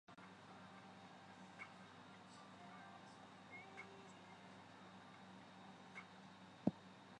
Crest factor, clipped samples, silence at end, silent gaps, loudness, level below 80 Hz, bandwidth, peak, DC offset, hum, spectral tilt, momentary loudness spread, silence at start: 34 dB; under 0.1%; 0 s; none; -56 LUFS; -86 dBFS; 10 kHz; -22 dBFS; under 0.1%; none; -6 dB/octave; 11 LU; 0.1 s